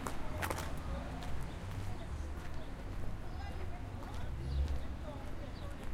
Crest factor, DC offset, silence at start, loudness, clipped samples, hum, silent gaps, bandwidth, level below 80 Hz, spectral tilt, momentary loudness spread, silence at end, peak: 20 dB; under 0.1%; 0 s; -43 LUFS; under 0.1%; none; none; 16.5 kHz; -42 dBFS; -5.5 dB/octave; 7 LU; 0 s; -18 dBFS